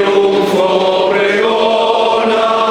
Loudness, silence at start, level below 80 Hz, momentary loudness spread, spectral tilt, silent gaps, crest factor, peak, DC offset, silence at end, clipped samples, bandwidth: -12 LUFS; 0 s; -54 dBFS; 1 LU; -4.5 dB/octave; none; 12 dB; 0 dBFS; under 0.1%; 0 s; under 0.1%; 15.5 kHz